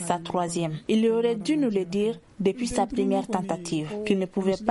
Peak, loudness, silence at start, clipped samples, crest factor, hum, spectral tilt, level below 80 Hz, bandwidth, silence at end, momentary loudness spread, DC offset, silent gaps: -8 dBFS; -26 LUFS; 0 s; under 0.1%; 18 dB; none; -5.5 dB/octave; -54 dBFS; 11.5 kHz; 0 s; 6 LU; under 0.1%; none